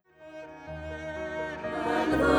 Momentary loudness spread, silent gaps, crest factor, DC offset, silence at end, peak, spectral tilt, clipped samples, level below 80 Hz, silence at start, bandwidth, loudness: 18 LU; none; 18 dB; under 0.1%; 0 s; -12 dBFS; -6 dB/octave; under 0.1%; -48 dBFS; 0.2 s; 20 kHz; -32 LUFS